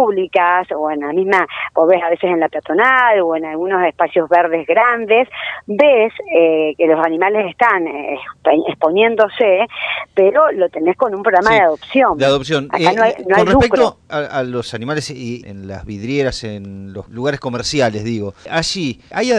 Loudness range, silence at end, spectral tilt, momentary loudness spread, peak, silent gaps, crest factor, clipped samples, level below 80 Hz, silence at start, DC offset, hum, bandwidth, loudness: 7 LU; 0 s; -5 dB/octave; 11 LU; 0 dBFS; none; 14 dB; under 0.1%; -44 dBFS; 0 s; under 0.1%; none; 11 kHz; -15 LUFS